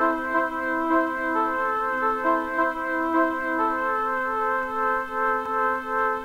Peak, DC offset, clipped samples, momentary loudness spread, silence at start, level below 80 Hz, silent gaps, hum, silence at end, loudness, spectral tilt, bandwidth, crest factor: -10 dBFS; under 0.1%; under 0.1%; 2 LU; 0 s; -54 dBFS; none; none; 0 s; -24 LUFS; -5 dB/octave; 16 kHz; 14 dB